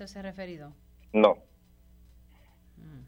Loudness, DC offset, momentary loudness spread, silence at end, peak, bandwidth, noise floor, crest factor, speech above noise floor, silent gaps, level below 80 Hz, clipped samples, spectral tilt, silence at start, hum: -27 LUFS; under 0.1%; 26 LU; 0.1 s; -6 dBFS; 15.5 kHz; -58 dBFS; 26 dB; 31 dB; none; -58 dBFS; under 0.1%; -6.5 dB/octave; 0 s; none